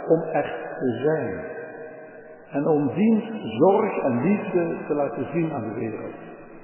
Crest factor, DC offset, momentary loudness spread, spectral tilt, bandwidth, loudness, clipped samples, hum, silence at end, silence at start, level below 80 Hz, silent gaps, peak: 18 dB; under 0.1%; 18 LU; -11.5 dB/octave; 3.2 kHz; -24 LUFS; under 0.1%; none; 0 s; 0 s; -62 dBFS; none; -6 dBFS